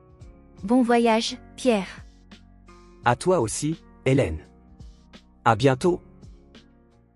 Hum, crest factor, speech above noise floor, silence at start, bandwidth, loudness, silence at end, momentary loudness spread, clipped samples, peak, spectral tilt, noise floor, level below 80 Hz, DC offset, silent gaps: none; 20 dB; 34 dB; 0.2 s; 12 kHz; -23 LUFS; 0.55 s; 12 LU; under 0.1%; -6 dBFS; -5.5 dB/octave; -56 dBFS; -50 dBFS; under 0.1%; none